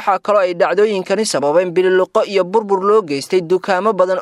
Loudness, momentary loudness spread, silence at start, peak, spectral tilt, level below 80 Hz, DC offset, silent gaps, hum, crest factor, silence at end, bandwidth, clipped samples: -15 LUFS; 3 LU; 0 s; 0 dBFS; -4.5 dB/octave; -68 dBFS; under 0.1%; none; none; 14 dB; 0 s; 12.5 kHz; under 0.1%